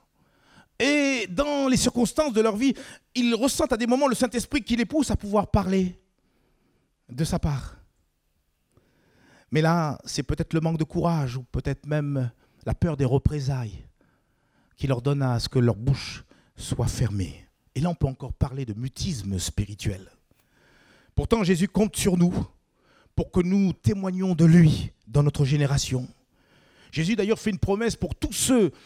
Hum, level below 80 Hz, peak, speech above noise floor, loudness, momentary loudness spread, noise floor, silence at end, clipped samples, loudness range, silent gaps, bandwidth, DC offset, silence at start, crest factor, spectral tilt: none; -42 dBFS; -6 dBFS; 47 dB; -25 LUFS; 11 LU; -71 dBFS; 0.15 s; under 0.1%; 7 LU; none; 15.5 kHz; under 0.1%; 0.8 s; 20 dB; -6 dB/octave